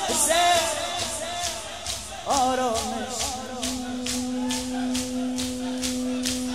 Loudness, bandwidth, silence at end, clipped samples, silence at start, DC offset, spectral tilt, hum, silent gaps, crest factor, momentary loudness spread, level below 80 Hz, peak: -26 LUFS; 16 kHz; 0 s; under 0.1%; 0 s; 0.3%; -2 dB/octave; none; none; 20 dB; 9 LU; -48 dBFS; -8 dBFS